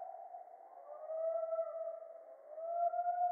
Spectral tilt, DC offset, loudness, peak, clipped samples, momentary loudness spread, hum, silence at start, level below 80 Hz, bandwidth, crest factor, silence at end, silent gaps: 8.5 dB/octave; under 0.1%; -40 LUFS; -26 dBFS; under 0.1%; 18 LU; none; 0 s; under -90 dBFS; 2.2 kHz; 14 dB; 0 s; none